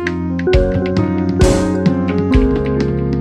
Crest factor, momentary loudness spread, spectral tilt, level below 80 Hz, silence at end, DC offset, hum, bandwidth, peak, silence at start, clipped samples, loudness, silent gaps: 14 dB; 4 LU; -7 dB/octave; -22 dBFS; 0 s; under 0.1%; none; 12.5 kHz; 0 dBFS; 0 s; under 0.1%; -15 LUFS; none